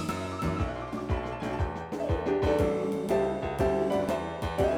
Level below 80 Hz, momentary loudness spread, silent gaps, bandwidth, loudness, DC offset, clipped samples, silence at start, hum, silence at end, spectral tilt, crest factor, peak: -40 dBFS; 7 LU; none; 18.5 kHz; -30 LUFS; under 0.1%; under 0.1%; 0 s; none; 0 s; -7 dB/octave; 14 dB; -14 dBFS